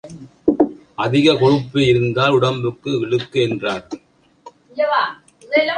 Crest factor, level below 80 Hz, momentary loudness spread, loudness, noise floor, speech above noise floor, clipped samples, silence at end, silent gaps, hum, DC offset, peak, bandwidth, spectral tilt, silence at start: 16 dB; -52 dBFS; 11 LU; -18 LUFS; -45 dBFS; 28 dB; under 0.1%; 0 s; none; none; under 0.1%; -2 dBFS; 9.8 kHz; -6.5 dB/octave; 0.05 s